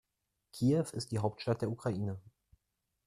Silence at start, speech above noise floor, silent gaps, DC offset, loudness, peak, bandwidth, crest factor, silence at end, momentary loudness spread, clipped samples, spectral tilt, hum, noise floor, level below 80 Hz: 0.55 s; 51 dB; none; under 0.1%; -35 LUFS; -16 dBFS; 14.5 kHz; 20 dB; 0.75 s; 11 LU; under 0.1%; -7 dB/octave; none; -85 dBFS; -68 dBFS